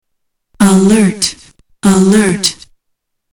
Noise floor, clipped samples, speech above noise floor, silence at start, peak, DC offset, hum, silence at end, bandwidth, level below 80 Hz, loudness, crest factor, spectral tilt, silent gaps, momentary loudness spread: -69 dBFS; under 0.1%; 59 dB; 0.6 s; -2 dBFS; under 0.1%; none; 0.8 s; 18.5 kHz; -42 dBFS; -11 LUFS; 10 dB; -5 dB/octave; none; 8 LU